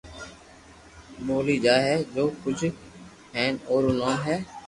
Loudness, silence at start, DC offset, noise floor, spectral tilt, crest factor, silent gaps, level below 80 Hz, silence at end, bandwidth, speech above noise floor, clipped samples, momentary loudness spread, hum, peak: -25 LUFS; 0.05 s; under 0.1%; -50 dBFS; -5.5 dB/octave; 20 dB; none; -54 dBFS; 0 s; 11.5 kHz; 25 dB; under 0.1%; 21 LU; none; -8 dBFS